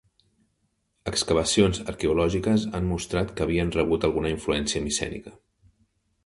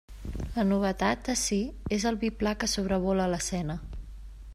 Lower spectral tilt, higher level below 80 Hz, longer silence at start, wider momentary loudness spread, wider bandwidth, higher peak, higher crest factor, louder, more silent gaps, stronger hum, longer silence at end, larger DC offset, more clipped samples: about the same, -4.5 dB/octave vs -4.5 dB/octave; about the same, -42 dBFS vs -42 dBFS; first, 1.05 s vs 0.1 s; second, 6 LU vs 14 LU; second, 11.5 kHz vs 14 kHz; first, -8 dBFS vs -12 dBFS; about the same, 20 dB vs 16 dB; first, -25 LUFS vs -29 LUFS; neither; neither; first, 0.95 s vs 0 s; neither; neither